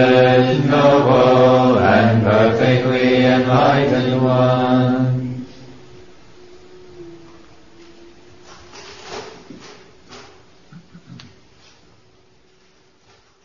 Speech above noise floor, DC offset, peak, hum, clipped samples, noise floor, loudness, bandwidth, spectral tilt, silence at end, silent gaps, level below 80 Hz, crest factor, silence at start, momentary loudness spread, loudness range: 41 dB; 0.6%; -2 dBFS; none; under 0.1%; -55 dBFS; -14 LUFS; 7.2 kHz; -7.5 dB/octave; 2.3 s; none; -52 dBFS; 16 dB; 0 s; 21 LU; 25 LU